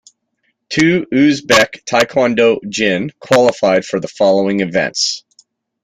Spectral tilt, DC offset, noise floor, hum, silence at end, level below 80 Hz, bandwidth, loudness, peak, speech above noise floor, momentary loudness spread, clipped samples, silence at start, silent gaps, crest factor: -4 dB/octave; under 0.1%; -66 dBFS; none; 0.65 s; -52 dBFS; 16 kHz; -14 LUFS; 0 dBFS; 53 dB; 5 LU; under 0.1%; 0.7 s; none; 14 dB